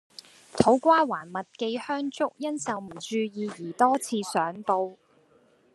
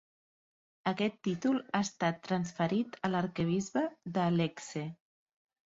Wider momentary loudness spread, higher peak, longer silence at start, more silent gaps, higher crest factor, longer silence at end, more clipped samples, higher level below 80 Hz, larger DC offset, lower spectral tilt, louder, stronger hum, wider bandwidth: first, 13 LU vs 6 LU; first, -2 dBFS vs -14 dBFS; second, 0.55 s vs 0.85 s; neither; first, 26 dB vs 20 dB; about the same, 0.8 s vs 0.8 s; neither; about the same, -68 dBFS vs -70 dBFS; neither; second, -4.5 dB/octave vs -6 dB/octave; first, -27 LUFS vs -33 LUFS; neither; first, 12.5 kHz vs 8 kHz